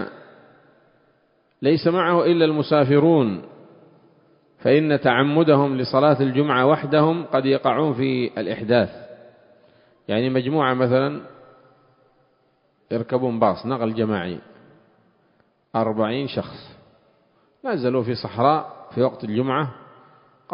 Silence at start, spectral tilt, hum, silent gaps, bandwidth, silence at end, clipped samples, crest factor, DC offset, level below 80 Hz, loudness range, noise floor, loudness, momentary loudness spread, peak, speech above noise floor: 0 s; -11.5 dB/octave; none; none; 5.4 kHz; 0.75 s; under 0.1%; 20 dB; under 0.1%; -60 dBFS; 8 LU; -64 dBFS; -20 LUFS; 12 LU; -2 dBFS; 44 dB